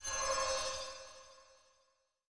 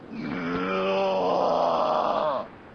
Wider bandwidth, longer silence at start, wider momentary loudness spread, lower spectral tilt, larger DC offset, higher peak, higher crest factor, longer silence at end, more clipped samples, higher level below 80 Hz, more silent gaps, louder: first, 10.5 kHz vs 6.8 kHz; about the same, 0 s vs 0 s; first, 21 LU vs 8 LU; second, 0.5 dB/octave vs -6 dB/octave; neither; second, -24 dBFS vs -12 dBFS; about the same, 18 dB vs 14 dB; about the same, 0 s vs 0 s; neither; about the same, -62 dBFS vs -58 dBFS; neither; second, -37 LUFS vs -25 LUFS